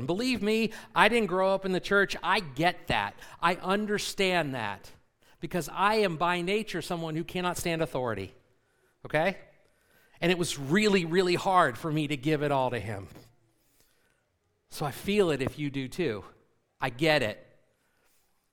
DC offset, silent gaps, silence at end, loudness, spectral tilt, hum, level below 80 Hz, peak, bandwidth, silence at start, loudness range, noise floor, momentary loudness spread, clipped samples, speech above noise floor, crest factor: under 0.1%; none; 1.1 s; -28 LUFS; -5 dB/octave; none; -54 dBFS; -4 dBFS; 18.5 kHz; 0 s; 6 LU; -74 dBFS; 11 LU; under 0.1%; 46 dB; 26 dB